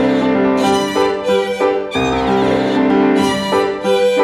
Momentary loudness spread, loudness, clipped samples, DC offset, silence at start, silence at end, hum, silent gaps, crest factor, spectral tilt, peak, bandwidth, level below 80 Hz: 3 LU; -15 LUFS; under 0.1%; under 0.1%; 0 s; 0 s; none; none; 12 dB; -5 dB/octave; -2 dBFS; 13.5 kHz; -42 dBFS